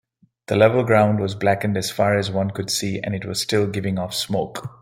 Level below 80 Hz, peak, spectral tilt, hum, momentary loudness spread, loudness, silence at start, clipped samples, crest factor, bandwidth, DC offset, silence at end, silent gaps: -56 dBFS; -2 dBFS; -5 dB/octave; none; 8 LU; -21 LUFS; 0.5 s; under 0.1%; 20 dB; 16.5 kHz; under 0.1%; 0.15 s; none